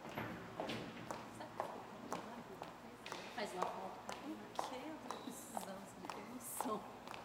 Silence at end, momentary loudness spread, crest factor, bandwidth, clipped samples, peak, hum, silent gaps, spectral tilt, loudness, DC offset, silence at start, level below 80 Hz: 0 s; 8 LU; 26 dB; 17 kHz; under 0.1%; -20 dBFS; none; none; -4 dB/octave; -48 LUFS; under 0.1%; 0 s; -76 dBFS